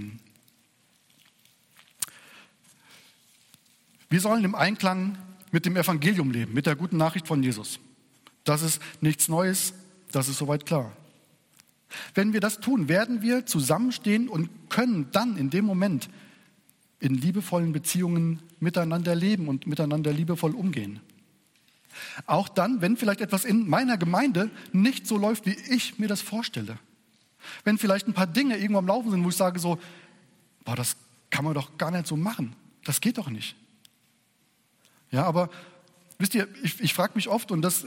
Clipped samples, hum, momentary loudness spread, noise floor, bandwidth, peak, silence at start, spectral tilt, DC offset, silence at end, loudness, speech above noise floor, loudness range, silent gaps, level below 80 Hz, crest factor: under 0.1%; none; 11 LU; -67 dBFS; 17 kHz; -8 dBFS; 0 s; -5 dB/octave; under 0.1%; 0 s; -26 LUFS; 41 dB; 6 LU; none; -70 dBFS; 20 dB